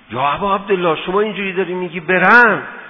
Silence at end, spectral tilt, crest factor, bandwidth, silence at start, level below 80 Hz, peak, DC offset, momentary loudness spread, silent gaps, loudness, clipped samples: 0 s; -7 dB/octave; 16 dB; 6 kHz; 0.1 s; -50 dBFS; 0 dBFS; under 0.1%; 11 LU; none; -14 LUFS; 0.2%